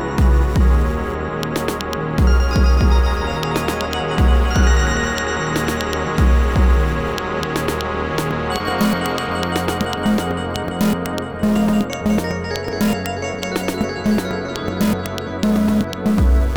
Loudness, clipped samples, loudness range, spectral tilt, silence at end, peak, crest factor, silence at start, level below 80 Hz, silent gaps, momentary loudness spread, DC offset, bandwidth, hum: -19 LUFS; under 0.1%; 3 LU; -6 dB/octave; 0 s; 0 dBFS; 16 dB; 0 s; -20 dBFS; none; 7 LU; 0.5%; 19.5 kHz; none